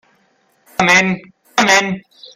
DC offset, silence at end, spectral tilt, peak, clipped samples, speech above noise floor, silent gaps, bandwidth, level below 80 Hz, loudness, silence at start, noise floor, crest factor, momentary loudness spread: under 0.1%; 0.35 s; -3 dB/octave; 0 dBFS; under 0.1%; 44 dB; none; 16 kHz; -54 dBFS; -13 LUFS; 0.8 s; -59 dBFS; 18 dB; 15 LU